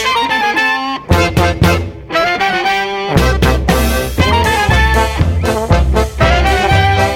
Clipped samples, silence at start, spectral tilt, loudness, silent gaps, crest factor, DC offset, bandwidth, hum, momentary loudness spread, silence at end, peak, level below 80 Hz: under 0.1%; 0 s; -5 dB/octave; -12 LUFS; none; 12 dB; under 0.1%; 17 kHz; none; 4 LU; 0 s; 0 dBFS; -18 dBFS